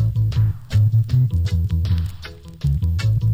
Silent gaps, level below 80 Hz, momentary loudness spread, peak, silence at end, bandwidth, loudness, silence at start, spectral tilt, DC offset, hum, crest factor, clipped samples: none; -28 dBFS; 9 LU; -8 dBFS; 0 s; 16 kHz; -20 LUFS; 0 s; -7.5 dB/octave; under 0.1%; none; 10 dB; under 0.1%